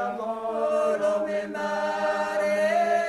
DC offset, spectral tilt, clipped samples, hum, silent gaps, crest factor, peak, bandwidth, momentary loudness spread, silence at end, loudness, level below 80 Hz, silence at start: under 0.1%; -4.5 dB/octave; under 0.1%; none; none; 12 dB; -12 dBFS; 12.5 kHz; 6 LU; 0 s; -26 LUFS; -66 dBFS; 0 s